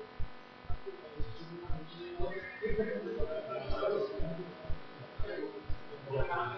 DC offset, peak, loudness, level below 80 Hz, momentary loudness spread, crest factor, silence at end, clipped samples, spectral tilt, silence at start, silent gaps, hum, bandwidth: under 0.1%; -20 dBFS; -40 LUFS; -44 dBFS; 12 LU; 16 dB; 0 s; under 0.1%; -5 dB/octave; 0 s; none; none; 5.8 kHz